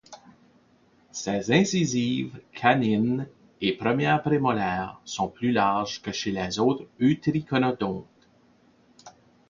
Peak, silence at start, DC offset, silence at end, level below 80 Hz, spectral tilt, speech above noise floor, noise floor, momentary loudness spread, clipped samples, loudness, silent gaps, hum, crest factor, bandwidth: -4 dBFS; 0.1 s; under 0.1%; 0.4 s; -58 dBFS; -5.5 dB/octave; 36 dB; -61 dBFS; 9 LU; under 0.1%; -25 LUFS; none; none; 22 dB; 7.4 kHz